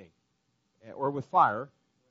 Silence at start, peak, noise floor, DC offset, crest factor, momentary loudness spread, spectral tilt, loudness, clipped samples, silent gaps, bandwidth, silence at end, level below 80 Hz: 0 s; -10 dBFS; -76 dBFS; under 0.1%; 22 dB; 21 LU; -5 dB/octave; -28 LUFS; under 0.1%; none; 7.4 kHz; 0.45 s; -78 dBFS